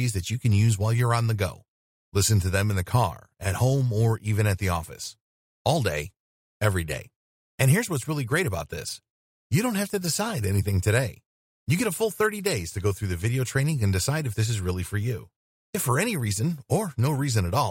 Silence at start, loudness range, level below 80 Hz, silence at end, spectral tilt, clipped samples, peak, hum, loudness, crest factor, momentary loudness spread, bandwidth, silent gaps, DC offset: 0 s; 3 LU; -48 dBFS; 0 s; -5 dB/octave; under 0.1%; -8 dBFS; none; -26 LUFS; 18 dB; 9 LU; 16.5 kHz; 1.68-2.12 s, 5.21-5.65 s, 6.20-6.60 s, 7.16-7.58 s, 9.10-9.50 s, 11.26-11.67 s, 15.36-15.73 s; under 0.1%